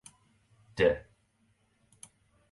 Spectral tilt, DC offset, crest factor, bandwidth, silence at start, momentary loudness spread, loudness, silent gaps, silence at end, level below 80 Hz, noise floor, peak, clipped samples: -5 dB/octave; under 0.1%; 24 dB; 11.5 kHz; 0.75 s; 26 LU; -29 LUFS; none; 1.5 s; -56 dBFS; -71 dBFS; -12 dBFS; under 0.1%